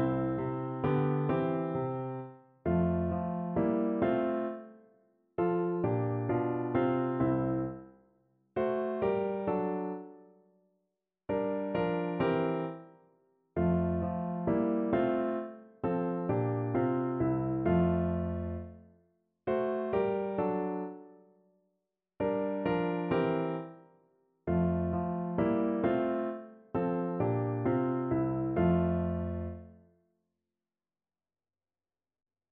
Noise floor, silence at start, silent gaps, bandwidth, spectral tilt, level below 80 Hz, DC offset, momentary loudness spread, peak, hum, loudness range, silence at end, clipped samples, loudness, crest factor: under -90 dBFS; 0 s; none; 4 kHz; -8.5 dB/octave; -56 dBFS; under 0.1%; 10 LU; -16 dBFS; none; 4 LU; 2.8 s; under 0.1%; -32 LUFS; 16 dB